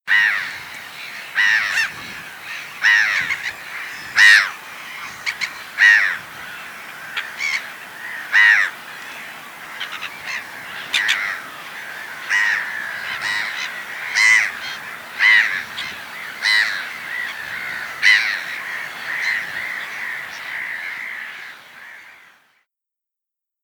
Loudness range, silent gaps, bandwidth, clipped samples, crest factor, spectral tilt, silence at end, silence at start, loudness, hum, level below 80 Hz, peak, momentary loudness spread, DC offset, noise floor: 9 LU; none; over 20 kHz; under 0.1%; 20 dB; 1 dB/octave; 1.5 s; 0.05 s; -17 LUFS; none; -66 dBFS; 0 dBFS; 20 LU; under 0.1%; -85 dBFS